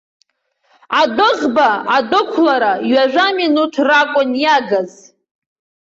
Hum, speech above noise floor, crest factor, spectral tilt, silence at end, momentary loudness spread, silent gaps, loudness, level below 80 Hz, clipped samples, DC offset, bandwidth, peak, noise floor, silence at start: none; 49 dB; 12 dB; -4 dB/octave; 0.95 s; 3 LU; none; -14 LUFS; -62 dBFS; under 0.1%; under 0.1%; 7.8 kHz; -2 dBFS; -62 dBFS; 0.9 s